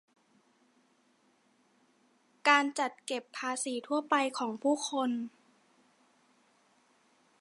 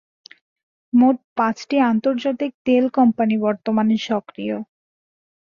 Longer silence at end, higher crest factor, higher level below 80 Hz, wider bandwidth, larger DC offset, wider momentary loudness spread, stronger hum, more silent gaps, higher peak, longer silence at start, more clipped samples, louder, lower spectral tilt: first, 2.1 s vs 0.75 s; first, 26 dB vs 16 dB; second, under -90 dBFS vs -66 dBFS; first, 11.5 kHz vs 7.2 kHz; neither; about the same, 12 LU vs 11 LU; neither; second, none vs 1.24-1.36 s, 2.54-2.65 s; second, -10 dBFS vs -6 dBFS; first, 2.45 s vs 0.95 s; neither; second, -31 LUFS vs -20 LUFS; second, -1.5 dB/octave vs -6.5 dB/octave